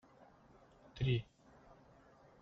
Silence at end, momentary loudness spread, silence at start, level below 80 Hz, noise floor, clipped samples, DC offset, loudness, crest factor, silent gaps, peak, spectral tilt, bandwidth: 1.2 s; 27 LU; 0.95 s; -62 dBFS; -65 dBFS; under 0.1%; under 0.1%; -39 LUFS; 20 dB; none; -26 dBFS; -6 dB/octave; 6.4 kHz